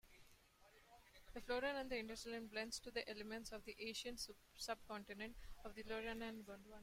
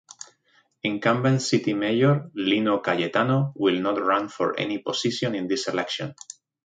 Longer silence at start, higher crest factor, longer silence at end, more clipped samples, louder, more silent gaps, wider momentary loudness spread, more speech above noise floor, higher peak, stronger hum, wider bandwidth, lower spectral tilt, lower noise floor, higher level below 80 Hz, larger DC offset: second, 0.05 s vs 0.2 s; about the same, 20 dB vs 18 dB; second, 0 s vs 0.5 s; neither; second, -49 LUFS vs -24 LUFS; neither; first, 14 LU vs 10 LU; second, 21 dB vs 41 dB; second, -32 dBFS vs -6 dBFS; neither; first, 16.5 kHz vs 9.4 kHz; second, -2.5 dB/octave vs -5.5 dB/octave; first, -71 dBFS vs -64 dBFS; about the same, -66 dBFS vs -68 dBFS; neither